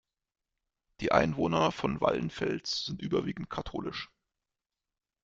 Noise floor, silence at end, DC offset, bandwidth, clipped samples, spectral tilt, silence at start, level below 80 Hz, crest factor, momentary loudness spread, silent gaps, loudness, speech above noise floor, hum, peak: -89 dBFS; 1.2 s; under 0.1%; 7.8 kHz; under 0.1%; -5.5 dB/octave; 1 s; -56 dBFS; 26 dB; 11 LU; none; -31 LUFS; 59 dB; none; -8 dBFS